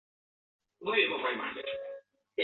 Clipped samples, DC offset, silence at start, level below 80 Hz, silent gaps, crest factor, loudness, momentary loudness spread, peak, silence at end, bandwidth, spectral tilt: under 0.1%; under 0.1%; 0.8 s; -78 dBFS; none; 20 dB; -32 LUFS; 16 LU; -14 dBFS; 0 s; 4.3 kHz; 0.5 dB/octave